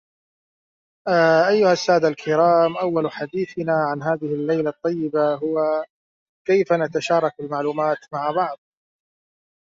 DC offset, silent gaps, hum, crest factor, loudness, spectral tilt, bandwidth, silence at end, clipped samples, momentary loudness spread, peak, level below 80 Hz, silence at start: under 0.1%; 5.90-6.45 s; none; 16 dB; -20 LUFS; -6 dB/octave; 7.6 kHz; 1.15 s; under 0.1%; 10 LU; -4 dBFS; -68 dBFS; 1.05 s